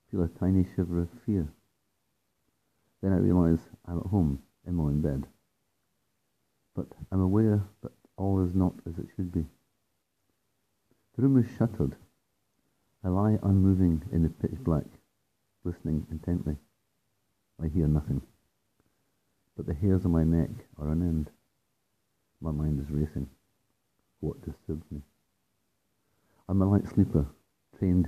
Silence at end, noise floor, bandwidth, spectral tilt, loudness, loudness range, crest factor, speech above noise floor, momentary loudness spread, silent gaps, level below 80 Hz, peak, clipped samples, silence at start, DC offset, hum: 0 s; -78 dBFS; 14 kHz; -10.5 dB/octave; -29 LUFS; 7 LU; 20 dB; 51 dB; 15 LU; none; -46 dBFS; -10 dBFS; under 0.1%; 0.1 s; under 0.1%; none